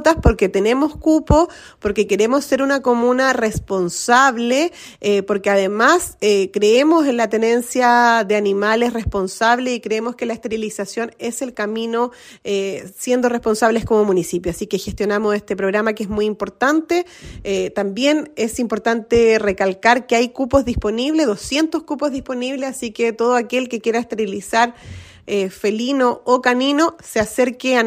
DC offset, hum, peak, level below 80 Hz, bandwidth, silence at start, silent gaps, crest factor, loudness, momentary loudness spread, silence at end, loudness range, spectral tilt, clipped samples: under 0.1%; none; 0 dBFS; -36 dBFS; 16 kHz; 0 s; none; 16 dB; -18 LUFS; 9 LU; 0 s; 5 LU; -4.5 dB/octave; under 0.1%